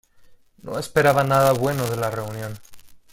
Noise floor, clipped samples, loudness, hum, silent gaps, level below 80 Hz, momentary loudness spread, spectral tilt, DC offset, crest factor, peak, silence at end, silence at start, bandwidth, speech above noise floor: -50 dBFS; under 0.1%; -21 LUFS; none; none; -52 dBFS; 17 LU; -5.5 dB/octave; under 0.1%; 18 dB; -4 dBFS; 0.15 s; 0.3 s; 17 kHz; 29 dB